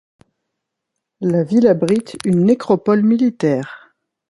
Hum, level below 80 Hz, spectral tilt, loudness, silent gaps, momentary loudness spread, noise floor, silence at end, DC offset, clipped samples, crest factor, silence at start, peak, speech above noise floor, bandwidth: none; -60 dBFS; -8 dB/octave; -16 LUFS; none; 7 LU; -78 dBFS; 0.55 s; under 0.1%; under 0.1%; 16 dB; 1.2 s; -2 dBFS; 63 dB; 11.5 kHz